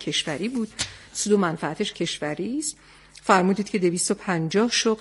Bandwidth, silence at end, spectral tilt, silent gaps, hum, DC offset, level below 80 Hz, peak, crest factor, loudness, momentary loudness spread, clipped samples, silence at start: 11.5 kHz; 0 s; -4 dB/octave; none; none; under 0.1%; -58 dBFS; -2 dBFS; 22 dB; -24 LUFS; 9 LU; under 0.1%; 0 s